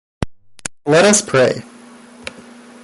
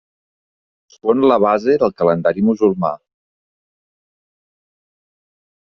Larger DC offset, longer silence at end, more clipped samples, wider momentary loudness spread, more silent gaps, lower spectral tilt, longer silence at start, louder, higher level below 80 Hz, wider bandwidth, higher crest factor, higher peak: neither; second, 1.2 s vs 2.7 s; neither; first, 22 LU vs 9 LU; neither; second, -3.5 dB/octave vs -6.5 dB/octave; second, 0.2 s vs 1.05 s; first, -13 LUFS vs -16 LUFS; first, -44 dBFS vs -58 dBFS; first, 11.5 kHz vs 6.4 kHz; about the same, 18 dB vs 16 dB; about the same, 0 dBFS vs -2 dBFS